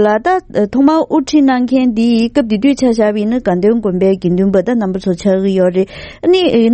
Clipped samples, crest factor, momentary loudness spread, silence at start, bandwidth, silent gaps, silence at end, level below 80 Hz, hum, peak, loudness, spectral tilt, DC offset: under 0.1%; 12 dB; 4 LU; 0 s; 8.8 kHz; none; 0 s; -42 dBFS; none; 0 dBFS; -13 LUFS; -7 dB/octave; under 0.1%